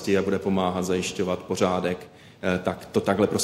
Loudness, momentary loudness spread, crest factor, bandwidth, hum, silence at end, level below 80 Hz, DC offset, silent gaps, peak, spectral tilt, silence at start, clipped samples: -26 LUFS; 5 LU; 18 dB; 14.5 kHz; none; 0 s; -56 dBFS; under 0.1%; none; -6 dBFS; -5 dB/octave; 0 s; under 0.1%